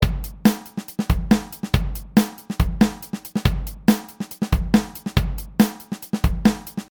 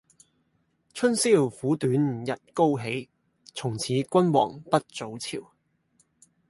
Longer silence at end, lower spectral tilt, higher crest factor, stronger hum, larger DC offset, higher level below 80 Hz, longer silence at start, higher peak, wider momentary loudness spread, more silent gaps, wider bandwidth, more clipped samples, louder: second, 0.05 s vs 1.05 s; about the same, -6 dB/octave vs -5.5 dB/octave; about the same, 20 dB vs 22 dB; neither; neither; first, -28 dBFS vs -68 dBFS; second, 0 s vs 0.95 s; about the same, -2 dBFS vs -4 dBFS; second, 9 LU vs 13 LU; neither; first, 19.5 kHz vs 11.5 kHz; neither; first, -22 LUFS vs -26 LUFS